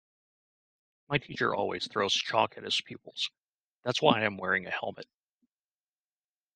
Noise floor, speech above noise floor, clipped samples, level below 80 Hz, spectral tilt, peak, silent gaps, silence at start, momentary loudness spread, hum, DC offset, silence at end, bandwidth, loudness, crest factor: under -90 dBFS; over 60 dB; under 0.1%; -74 dBFS; -3.5 dB/octave; -6 dBFS; 3.42-3.82 s; 1.1 s; 10 LU; none; under 0.1%; 1.5 s; 10 kHz; -30 LUFS; 28 dB